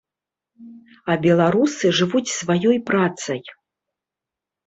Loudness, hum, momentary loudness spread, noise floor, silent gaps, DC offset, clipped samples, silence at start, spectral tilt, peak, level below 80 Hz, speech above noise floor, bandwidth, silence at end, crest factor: -19 LUFS; none; 12 LU; -88 dBFS; none; under 0.1%; under 0.1%; 0.6 s; -5 dB/octave; -4 dBFS; -62 dBFS; 68 dB; 8.4 kHz; 1.15 s; 16 dB